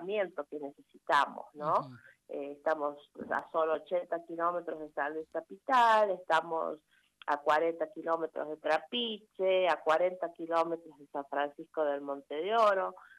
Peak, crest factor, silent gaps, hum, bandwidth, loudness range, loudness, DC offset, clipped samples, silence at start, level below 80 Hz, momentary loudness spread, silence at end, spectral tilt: -14 dBFS; 18 dB; none; none; 12.5 kHz; 4 LU; -32 LUFS; under 0.1%; under 0.1%; 0 s; -82 dBFS; 14 LU; 0.15 s; -4.5 dB/octave